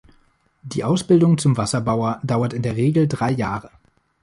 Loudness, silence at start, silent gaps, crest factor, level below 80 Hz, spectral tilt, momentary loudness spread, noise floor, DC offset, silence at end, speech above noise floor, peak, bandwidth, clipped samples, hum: -20 LUFS; 0.65 s; none; 16 dB; -50 dBFS; -6.5 dB/octave; 10 LU; -59 dBFS; under 0.1%; 0.55 s; 40 dB; -4 dBFS; 11.5 kHz; under 0.1%; none